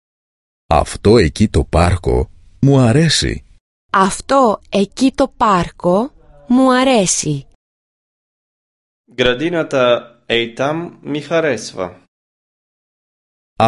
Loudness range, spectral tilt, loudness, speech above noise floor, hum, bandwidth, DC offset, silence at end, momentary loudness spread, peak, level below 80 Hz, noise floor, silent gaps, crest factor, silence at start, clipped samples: 5 LU; -5 dB/octave; -15 LUFS; over 76 dB; none; 11.5 kHz; under 0.1%; 0 s; 13 LU; 0 dBFS; -30 dBFS; under -90 dBFS; 3.60-3.89 s, 7.55-9.04 s, 12.08-13.56 s; 16 dB; 0.7 s; under 0.1%